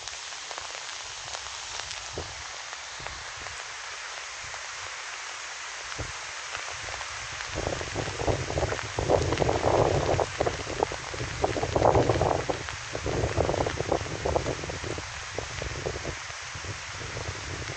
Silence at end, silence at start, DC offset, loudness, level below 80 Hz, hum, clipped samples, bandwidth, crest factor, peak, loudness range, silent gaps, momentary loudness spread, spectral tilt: 0 s; 0 s; under 0.1%; -30 LUFS; -44 dBFS; none; under 0.1%; 9.2 kHz; 24 dB; -6 dBFS; 9 LU; none; 11 LU; -4 dB/octave